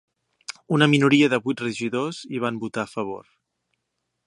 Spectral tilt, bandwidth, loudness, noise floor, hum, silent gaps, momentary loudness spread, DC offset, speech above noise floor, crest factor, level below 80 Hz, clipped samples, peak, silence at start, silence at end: -5.5 dB/octave; 11.5 kHz; -22 LUFS; -78 dBFS; none; none; 21 LU; under 0.1%; 56 dB; 22 dB; -68 dBFS; under 0.1%; -2 dBFS; 0.5 s; 1.1 s